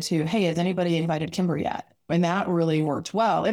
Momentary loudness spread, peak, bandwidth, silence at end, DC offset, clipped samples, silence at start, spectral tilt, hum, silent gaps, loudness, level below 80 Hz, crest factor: 5 LU; -10 dBFS; 13.5 kHz; 0 s; under 0.1%; under 0.1%; 0 s; -6 dB/octave; none; none; -25 LUFS; -60 dBFS; 14 dB